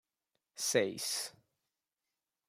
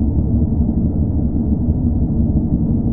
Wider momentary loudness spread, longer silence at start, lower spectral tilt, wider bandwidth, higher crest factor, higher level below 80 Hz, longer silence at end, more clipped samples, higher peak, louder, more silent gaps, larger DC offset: first, 13 LU vs 1 LU; first, 0.55 s vs 0 s; second, -2 dB/octave vs -15.5 dB/octave; first, 16 kHz vs 1.4 kHz; first, 24 dB vs 12 dB; second, -88 dBFS vs -20 dBFS; first, 1.2 s vs 0 s; neither; second, -14 dBFS vs -2 dBFS; second, -35 LUFS vs -18 LUFS; neither; neither